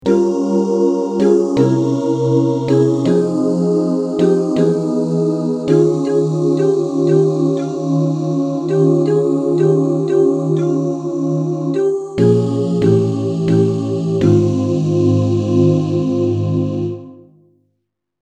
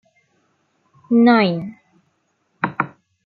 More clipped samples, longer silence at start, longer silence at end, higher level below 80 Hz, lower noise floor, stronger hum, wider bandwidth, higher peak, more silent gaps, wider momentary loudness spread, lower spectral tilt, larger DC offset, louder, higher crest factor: neither; second, 0.05 s vs 1.1 s; first, 1.1 s vs 0.4 s; first, -54 dBFS vs -68 dBFS; first, -72 dBFS vs -67 dBFS; neither; first, 9.4 kHz vs 4.9 kHz; about the same, 0 dBFS vs -2 dBFS; neither; second, 5 LU vs 14 LU; about the same, -8.5 dB/octave vs -9 dB/octave; neither; first, -15 LUFS vs -18 LUFS; about the same, 14 dB vs 18 dB